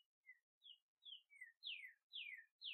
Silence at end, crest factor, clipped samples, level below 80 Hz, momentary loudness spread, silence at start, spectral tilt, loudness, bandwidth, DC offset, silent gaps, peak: 0 s; 18 dB; under 0.1%; under -90 dBFS; 15 LU; 0.25 s; 5 dB/octave; -56 LUFS; 12.5 kHz; under 0.1%; 0.42-0.61 s, 0.82-0.97 s, 1.57-1.61 s, 2.03-2.10 s, 2.51-2.59 s; -40 dBFS